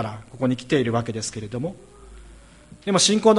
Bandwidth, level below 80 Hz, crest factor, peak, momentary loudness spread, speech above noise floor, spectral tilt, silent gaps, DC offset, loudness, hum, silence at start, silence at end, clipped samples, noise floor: 11.5 kHz; -52 dBFS; 18 dB; -4 dBFS; 15 LU; 25 dB; -4 dB/octave; none; under 0.1%; -23 LUFS; none; 0 s; 0 s; under 0.1%; -47 dBFS